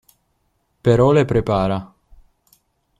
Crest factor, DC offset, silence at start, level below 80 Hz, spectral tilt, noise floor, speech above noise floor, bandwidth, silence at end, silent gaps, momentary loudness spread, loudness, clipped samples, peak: 16 dB; under 0.1%; 0.85 s; -40 dBFS; -8 dB/octave; -67 dBFS; 51 dB; 12.5 kHz; 1.15 s; none; 9 LU; -17 LUFS; under 0.1%; -4 dBFS